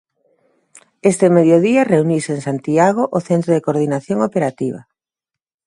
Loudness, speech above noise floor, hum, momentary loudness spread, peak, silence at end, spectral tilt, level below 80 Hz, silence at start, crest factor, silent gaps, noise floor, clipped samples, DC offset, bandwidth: -16 LUFS; 71 dB; none; 10 LU; 0 dBFS; 0.85 s; -7 dB/octave; -62 dBFS; 1.05 s; 16 dB; none; -86 dBFS; under 0.1%; under 0.1%; 11.5 kHz